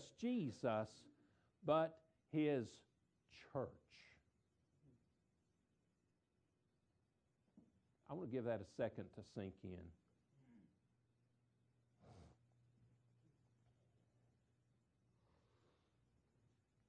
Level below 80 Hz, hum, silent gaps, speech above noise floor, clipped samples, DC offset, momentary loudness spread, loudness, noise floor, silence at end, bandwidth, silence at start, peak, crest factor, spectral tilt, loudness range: -82 dBFS; none; none; 40 dB; under 0.1%; under 0.1%; 18 LU; -46 LUFS; -85 dBFS; 4.6 s; 9.6 kHz; 0 s; -26 dBFS; 26 dB; -7 dB/octave; 15 LU